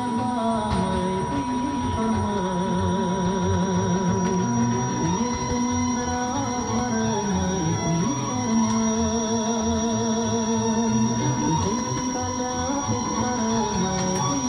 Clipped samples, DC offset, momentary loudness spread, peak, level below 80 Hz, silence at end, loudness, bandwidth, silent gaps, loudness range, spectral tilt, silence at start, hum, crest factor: under 0.1%; under 0.1%; 3 LU; -12 dBFS; -44 dBFS; 0 s; -24 LUFS; 10 kHz; none; 1 LU; -5 dB/octave; 0 s; none; 12 dB